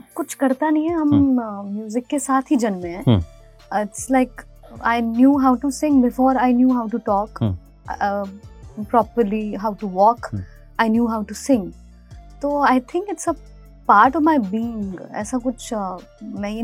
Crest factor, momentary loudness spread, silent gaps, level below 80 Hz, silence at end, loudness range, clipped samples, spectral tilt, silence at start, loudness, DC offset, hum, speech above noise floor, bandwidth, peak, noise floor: 20 dB; 13 LU; none; -44 dBFS; 0 s; 4 LU; under 0.1%; -6 dB/octave; 0.15 s; -20 LUFS; under 0.1%; none; 23 dB; 15.5 kHz; 0 dBFS; -42 dBFS